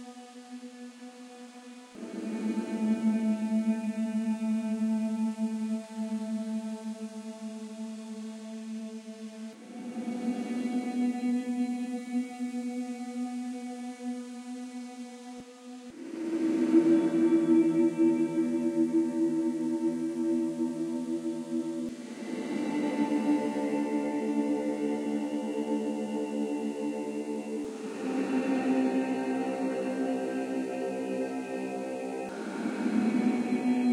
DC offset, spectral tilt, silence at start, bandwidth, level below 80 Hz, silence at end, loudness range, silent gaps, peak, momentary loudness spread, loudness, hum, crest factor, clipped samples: under 0.1%; -6.5 dB/octave; 0 s; 12 kHz; -84 dBFS; 0 s; 11 LU; none; -12 dBFS; 15 LU; -31 LUFS; none; 18 dB; under 0.1%